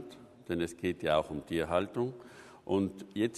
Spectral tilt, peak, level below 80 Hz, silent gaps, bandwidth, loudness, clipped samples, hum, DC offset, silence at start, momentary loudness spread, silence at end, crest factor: -6 dB/octave; -14 dBFS; -60 dBFS; none; 13 kHz; -34 LUFS; under 0.1%; none; under 0.1%; 0 s; 19 LU; 0 s; 20 dB